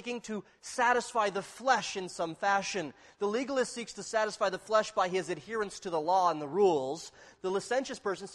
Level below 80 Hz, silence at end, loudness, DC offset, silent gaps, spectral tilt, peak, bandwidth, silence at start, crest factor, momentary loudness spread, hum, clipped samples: -72 dBFS; 0 s; -32 LUFS; under 0.1%; none; -3.5 dB/octave; -14 dBFS; 12.5 kHz; 0 s; 18 dB; 11 LU; none; under 0.1%